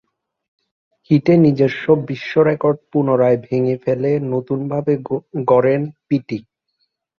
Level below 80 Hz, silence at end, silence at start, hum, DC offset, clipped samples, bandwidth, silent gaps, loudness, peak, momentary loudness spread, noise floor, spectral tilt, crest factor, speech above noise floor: -58 dBFS; 0.8 s; 1.1 s; none; under 0.1%; under 0.1%; 6.6 kHz; none; -17 LUFS; -2 dBFS; 8 LU; -70 dBFS; -9.5 dB/octave; 16 dB; 54 dB